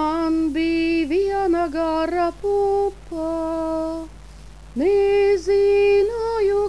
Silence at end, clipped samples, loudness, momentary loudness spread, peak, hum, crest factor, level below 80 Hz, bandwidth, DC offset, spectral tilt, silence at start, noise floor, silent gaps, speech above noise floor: 0 s; under 0.1%; -20 LUFS; 9 LU; -10 dBFS; none; 10 dB; -42 dBFS; 11 kHz; 0.4%; -6 dB/octave; 0 s; -41 dBFS; none; 20 dB